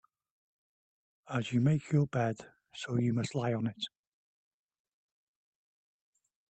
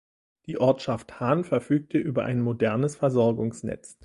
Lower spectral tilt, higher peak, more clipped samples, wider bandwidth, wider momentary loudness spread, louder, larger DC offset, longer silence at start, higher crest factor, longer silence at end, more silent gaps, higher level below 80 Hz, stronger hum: about the same, -7 dB/octave vs -7.5 dB/octave; second, -18 dBFS vs -8 dBFS; neither; second, 8.8 kHz vs 11.5 kHz; first, 13 LU vs 8 LU; second, -33 LUFS vs -26 LUFS; neither; first, 1.25 s vs 0.5 s; about the same, 18 dB vs 18 dB; first, 2.65 s vs 0.1 s; neither; second, -70 dBFS vs -60 dBFS; neither